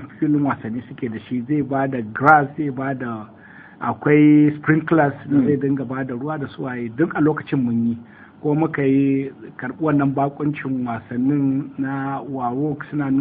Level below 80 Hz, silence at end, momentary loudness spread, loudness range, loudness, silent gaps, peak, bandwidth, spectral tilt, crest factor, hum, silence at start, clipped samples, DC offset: -56 dBFS; 0 s; 13 LU; 4 LU; -20 LUFS; none; 0 dBFS; 3.8 kHz; -11 dB/octave; 20 dB; none; 0 s; under 0.1%; under 0.1%